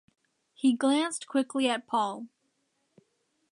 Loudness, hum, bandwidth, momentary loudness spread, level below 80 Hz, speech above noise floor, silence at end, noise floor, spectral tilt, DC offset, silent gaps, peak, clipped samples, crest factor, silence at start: -28 LUFS; none; 11 kHz; 9 LU; -86 dBFS; 48 dB; 1.25 s; -76 dBFS; -3 dB/octave; under 0.1%; none; -12 dBFS; under 0.1%; 18 dB; 0.65 s